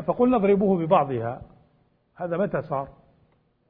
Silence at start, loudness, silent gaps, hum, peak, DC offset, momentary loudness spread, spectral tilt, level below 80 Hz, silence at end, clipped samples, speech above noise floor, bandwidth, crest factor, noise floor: 0 s; -23 LUFS; none; none; -6 dBFS; under 0.1%; 15 LU; -12 dB/octave; -56 dBFS; 0.8 s; under 0.1%; 42 dB; 4 kHz; 20 dB; -64 dBFS